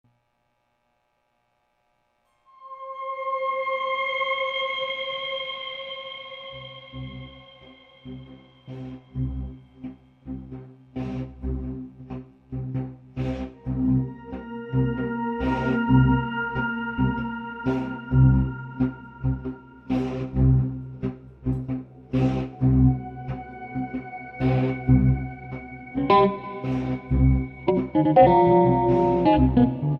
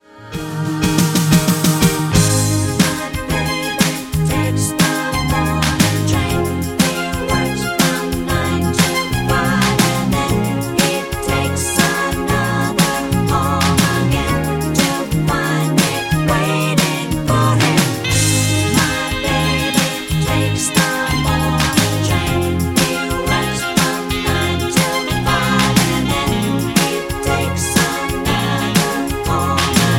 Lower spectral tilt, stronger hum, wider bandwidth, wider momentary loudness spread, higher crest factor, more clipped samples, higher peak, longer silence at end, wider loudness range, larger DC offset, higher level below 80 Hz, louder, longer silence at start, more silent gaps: first, -9.5 dB/octave vs -4.5 dB/octave; neither; second, 5.2 kHz vs 17 kHz; first, 19 LU vs 5 LU; first, 22 dB vs 16 dB; neither; second, -4 dBFS vs 0 dBFS; about the same, 0 s vs 0 s; first, 16 LU vs 2 LU; neither; second, -36 dBFS vs -30 dBFS; second, -24 LUFS vs -16 LUFS; first, 2.6 s vs 0.15 s; neither